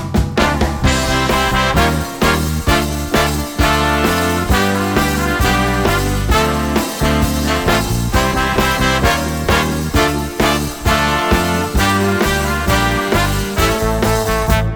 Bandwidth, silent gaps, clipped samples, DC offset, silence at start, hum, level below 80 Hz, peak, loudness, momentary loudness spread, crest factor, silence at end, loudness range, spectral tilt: over 20 kHz; none; under 0.1%; under 0.1%; 0 s; none; -22 dBFS; 0 dBFS; -15 LUFS; 3 LU; 14 dB; 0 s; 0 LU; -4.5 dB/octave